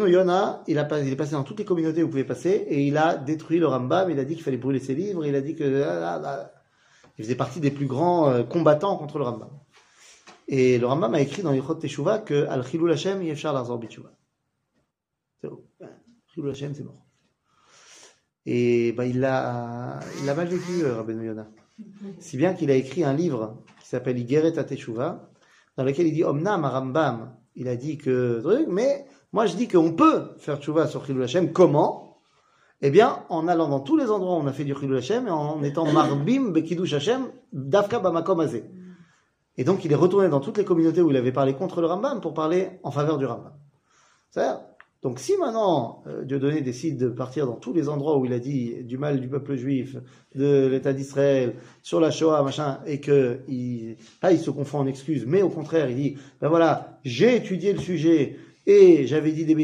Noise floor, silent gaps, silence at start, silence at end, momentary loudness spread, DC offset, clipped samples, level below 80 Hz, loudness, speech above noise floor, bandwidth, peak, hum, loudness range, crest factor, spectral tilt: -82 dBFS; none; 0 s; 0 s; 13 LU; under 0.1%; under 0.1%; -68 dBFS; -24 LUFS; 59 dB; 10.5 kHz; -4 dBFS; none; 6 LU; 20 dB; -7 dB/octave